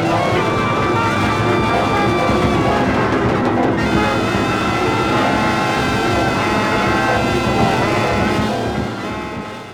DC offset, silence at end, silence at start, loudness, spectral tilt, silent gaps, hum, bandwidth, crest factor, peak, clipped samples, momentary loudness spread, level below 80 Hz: under 0.1%; 0 s; 0 s; -16 LUFS; -5.5 dB/octave; none; none; 18.5 kHz; 14 dB; -4 dBFS; under 0.1%; 4 LU; -34 dBFS